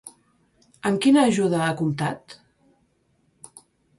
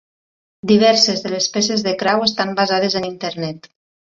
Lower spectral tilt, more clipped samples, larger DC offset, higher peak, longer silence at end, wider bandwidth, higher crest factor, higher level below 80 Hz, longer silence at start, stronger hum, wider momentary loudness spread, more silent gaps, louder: first, -5.5 dB/octave vs -3.5 dB/octave; neither; neither; second, -6 dBFS vs -2 dBFS; first, 1.65 s vs 0.6 s; first, 11.5 kHz vs 7.8 kHz; about the same, 18 dB vs 16 dB; about the same, -64 dBFS vs -60 dBFS; second, 0.05 s vs 0.65 s; neither; about the same, 12 LU vs 14 LU; neither; second, -21 LUFS vs -16 LUFS